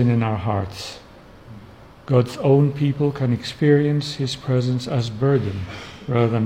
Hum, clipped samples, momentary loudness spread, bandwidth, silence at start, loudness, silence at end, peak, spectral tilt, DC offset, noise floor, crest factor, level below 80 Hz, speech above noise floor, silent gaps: none; under 0.1%; 14 LU; 10.5 kHz; 0 s; -21 LUFS; 0 s; -4 dBFS; -7.5 dB/octave; under 0.1%; -44 dBFS; 16 dB; -50 dBFS; 24 dB; none